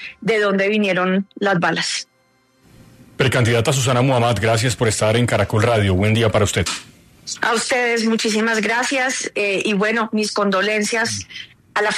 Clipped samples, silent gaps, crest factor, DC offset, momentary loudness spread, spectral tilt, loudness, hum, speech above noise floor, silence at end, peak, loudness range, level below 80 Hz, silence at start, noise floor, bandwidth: under 0.1%; none; 16 dB; under 0.1%; 6 LU; -4.5 dB/octave; -18 LUFS; none; 42 dB; 0 s; -4 dBFS; 3 LU; -50 dBFS; 0 s; -59 dBFS; 13.5 kHz